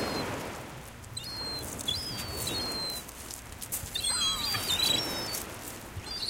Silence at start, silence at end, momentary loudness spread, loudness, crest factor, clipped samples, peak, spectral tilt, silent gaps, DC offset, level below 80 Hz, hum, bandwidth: 0 s; 0 s; 15 LU; -31 LUFS; 20 dB; under 0.1%; -14 dBFS; -2 dB/octave; none; under 0.1%; -50 dBFS; none; 17 kHz